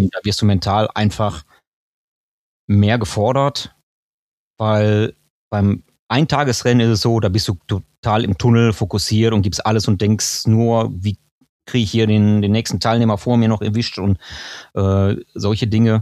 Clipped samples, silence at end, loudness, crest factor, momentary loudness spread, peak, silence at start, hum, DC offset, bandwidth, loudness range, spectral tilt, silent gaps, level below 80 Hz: under 0.1%; 0 s; -17 LUFS; 16 dB; 9 LU; 0 dBFS; 0 s; none; under 0.1%; 13.5 kHz; 3 LU; -6 dB/octave; 1.67-2.68 s, 3.83-4.54 s, 5.30-5.51 s, 5.99-6.07 s, 7.98-8.03 s, 11.31-11.41 s, 11.49-11.60 s; -44 dBFS